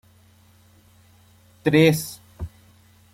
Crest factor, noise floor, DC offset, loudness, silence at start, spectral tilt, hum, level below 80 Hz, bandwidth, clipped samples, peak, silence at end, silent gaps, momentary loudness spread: 22 dB; -55 dBFS; under 0.1%; -19 LUFS; 1.65 s; -5.5 dB/octave; none; -50 dBFS; 16.5 kHz; under 0.1%; -4 dBFS; 0.65 s; none; 21 LU